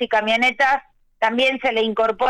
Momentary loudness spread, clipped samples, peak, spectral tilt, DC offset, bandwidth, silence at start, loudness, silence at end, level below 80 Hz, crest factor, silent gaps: 6 LU; under 0.1%; -8 dBFS; -3.5 dB/octave; under 0.1%; 13 kHz; 0 s; -19 LUFS; 0 s; -56 dBFS; 10 dB; none